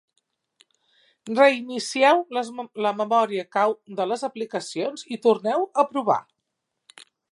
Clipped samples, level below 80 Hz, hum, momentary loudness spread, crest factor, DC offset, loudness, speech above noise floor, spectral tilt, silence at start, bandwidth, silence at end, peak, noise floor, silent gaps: under 0.1%; -82 dBFS; none; 11 LU; 20 dB; under 0.1%; -23 LUFS; 57 dB; -4 dB/octave; 1.25 s; 11.5 kHz; 1.1 s; -4 dBFS; -80 dBFS; none